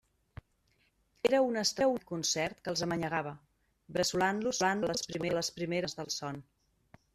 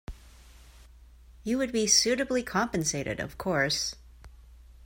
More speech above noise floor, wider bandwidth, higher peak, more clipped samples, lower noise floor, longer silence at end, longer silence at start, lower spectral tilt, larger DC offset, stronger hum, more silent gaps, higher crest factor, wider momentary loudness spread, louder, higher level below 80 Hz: first, 41 dB vs 25 dB; about the same, 15 kHz vs 16.5 kHz; second, -14 dBFS vs -8 dBFS; neither; first, -73 dBFS vs -53 dBFS; first, 0.7 s vs 0.15 s; first, 1.25 s vs 0.1 s; about the same, -3.5 dB/octave vs -2.5 dB/octave; neither; neither; neither; about the same, 20 dB vs 22 dB; second, 8 LU vs 13 LU; second, -32 LUFS vs -27 LUFS; second, -66 dBFS vs -50 dBFS